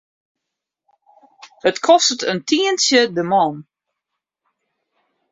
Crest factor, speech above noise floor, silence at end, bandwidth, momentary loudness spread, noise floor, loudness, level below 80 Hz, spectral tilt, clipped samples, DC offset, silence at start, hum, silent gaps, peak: 18 dB; 65 dB; 1.7 s; 8 kHz; 8 LU; -82 dBFS; -16 LUFS; -66 dBFS; -2.5 dB/octave; under 0.1%; under 0.1%; 1.65 s; none; none; -2 dBFS